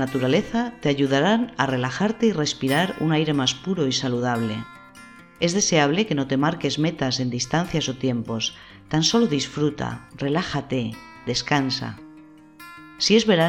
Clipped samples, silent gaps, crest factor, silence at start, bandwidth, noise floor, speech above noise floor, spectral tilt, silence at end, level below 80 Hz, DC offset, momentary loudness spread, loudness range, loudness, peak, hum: under 0.1%; none; 18 dB; 0 s; 17.5 kHz; -47 dBFS; 25 dB; -4.5 dB/octave; 0 s; -54 dBFS; under 0.1%; 10 LU; 3 LU; -23 LUFS; -4 dBFS; none